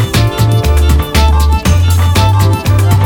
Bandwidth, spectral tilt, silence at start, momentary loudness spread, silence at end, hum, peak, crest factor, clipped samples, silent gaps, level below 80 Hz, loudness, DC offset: 18.5 kHz; -5.5 dB/octave; 0 s; 1 LU; 0 s; none; 0 dBFS; 8 dB; under 0.1%; none; -14 dBFS; -10 LUFS; under 0.1%